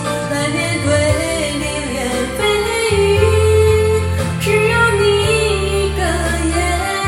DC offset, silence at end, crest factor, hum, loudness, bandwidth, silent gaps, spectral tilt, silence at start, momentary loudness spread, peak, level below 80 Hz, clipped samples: under 0.1%; 0 s; 14 dB; none; -15 LUFS; 16 kHz; none; -4.5 dB/octave; 0 s; 7 LU; -2 dBFS; -28 dBFS; under 0.1%